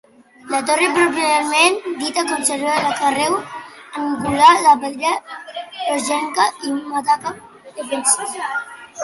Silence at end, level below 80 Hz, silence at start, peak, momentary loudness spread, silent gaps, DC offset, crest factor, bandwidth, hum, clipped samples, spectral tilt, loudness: 0 s; -58 dBFS; 0.45 s; 0 dBFS; 18 LU; none; under 0.1%; 18 dB; 12 kHz; none; under 0.1%; -1.5 dB/octave; -17 LUFS